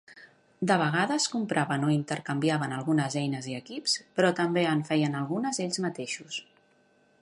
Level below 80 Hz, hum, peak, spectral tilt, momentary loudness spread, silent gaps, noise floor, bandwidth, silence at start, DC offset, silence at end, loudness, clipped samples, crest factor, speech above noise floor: -76 dBFS; none; -8 dBFS; -4.5 dB/octave; 9 LU; none; -65 dBFS; 11.5 kHz; 0.1 s; under 0.1%; 0.8 s; -28 LUFS; under 0.1%; 20 dB; 37 dB